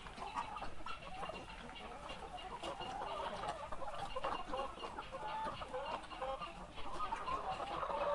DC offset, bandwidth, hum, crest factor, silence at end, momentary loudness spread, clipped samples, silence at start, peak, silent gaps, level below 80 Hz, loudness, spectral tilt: under 0.1%; 11.5 kHz; none; 18 dB; 0 s; 7 LU; under 0.1%; 0 s; -26 dBFS; none; -58 dBFS; -45 LUFS; -4 dB/octave